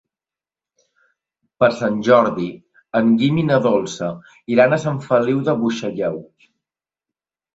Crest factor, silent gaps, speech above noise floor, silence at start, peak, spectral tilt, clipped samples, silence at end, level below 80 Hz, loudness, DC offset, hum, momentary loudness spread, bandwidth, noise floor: 18 dB; none; over 73 dB; 1.6 s; -2 dBFS; -6.5 dB/octave; under 0.1%; 1.3 s; -58 dBFS; -18 LUFS; under 0.1%; none; 12 LU; 8 kHz; under -90 dBFS